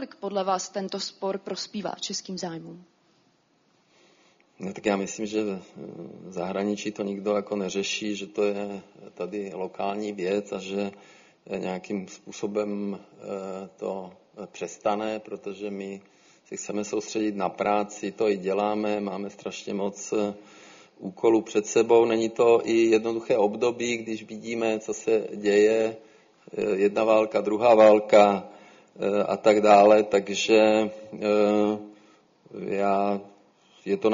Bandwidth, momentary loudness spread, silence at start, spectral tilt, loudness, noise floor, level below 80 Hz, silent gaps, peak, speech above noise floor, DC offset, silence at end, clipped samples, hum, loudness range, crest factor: 7.4 kHz; 17 LU; 0 s; -4 dB/octave; -25 LUFS; -66 dBFS; -70 dBFS; none; -4 dBFS; 41 dB; under 0.1%; 0 s; under 0.1%; none; 12 LU; 22 dB